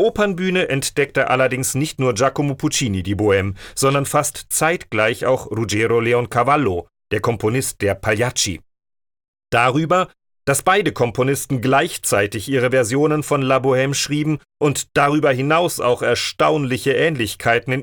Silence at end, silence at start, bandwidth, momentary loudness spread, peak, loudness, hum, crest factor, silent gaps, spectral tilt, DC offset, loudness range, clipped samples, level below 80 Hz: 0 s; 0 s; 19.5 kHz; 5 LU; -2 dBFS; -18 LUFS; none; 16 dB; 9.28-9.34 s; -4.5 dB/octave; under 0.1%; 2 LU; under 0.1%; -50 dBFS